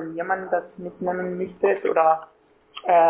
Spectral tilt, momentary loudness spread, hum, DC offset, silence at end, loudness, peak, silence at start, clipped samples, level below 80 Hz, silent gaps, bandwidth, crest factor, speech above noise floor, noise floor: -9.5 dB/octave; 11 LU; none; under 0.1%; 0 s; -24 LUFS; -6 dBFS; 0 s; under 0.1%; -66 dBFS; none; 3.6 kHz; 18 dB; 18 dB; -41 dBFS